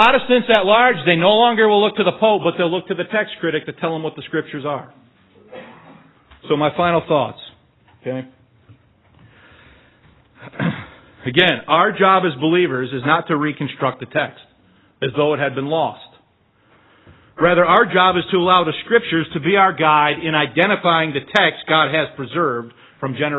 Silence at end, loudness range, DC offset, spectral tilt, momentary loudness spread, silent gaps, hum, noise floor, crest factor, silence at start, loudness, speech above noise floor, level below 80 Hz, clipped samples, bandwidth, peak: 0 s; 11 LU; under 0.1%; -7 dB/octave; 13 LU; none; none; -58 dBFS; 18 dB; 0 s; -17 LUFS; 41 dB; -56 dBFS; under 0.1%; 8 kHz; 0 dBFS